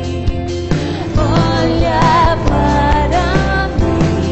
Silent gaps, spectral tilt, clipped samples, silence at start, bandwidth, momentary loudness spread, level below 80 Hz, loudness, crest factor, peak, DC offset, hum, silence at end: none; -6.5 dB/octave; under 0.1%; 0 s; 8.4 kHz; 7 LU; -20 dBFS; -14 LUFS; 10 dB; -4 dBFS; 0.8%; none; 0 s